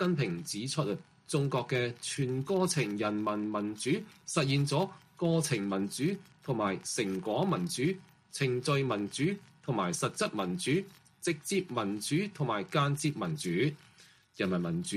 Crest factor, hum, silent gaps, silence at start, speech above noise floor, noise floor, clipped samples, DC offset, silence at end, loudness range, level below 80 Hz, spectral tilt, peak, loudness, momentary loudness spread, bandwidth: 20 dB; none; none; 0 s; 29 dB; -60 dBFS; under 0.1%; under 0.1%; 0 s; 1 LU; -70 dBFS; -5 dB/octave; -14 dBFS; -32 LUFS; 6 LU; 15 kHz